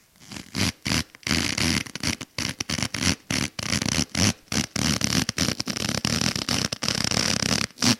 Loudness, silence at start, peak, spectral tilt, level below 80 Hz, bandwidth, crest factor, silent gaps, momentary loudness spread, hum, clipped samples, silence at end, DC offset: -24 LUFS; 0.2 s; -4 dBFS; -2.5 dB/octave; -44 dBFS; 17 kHz; 22 dB; none; 6 LU; none; under 0.1%; 0 s; under 0.1%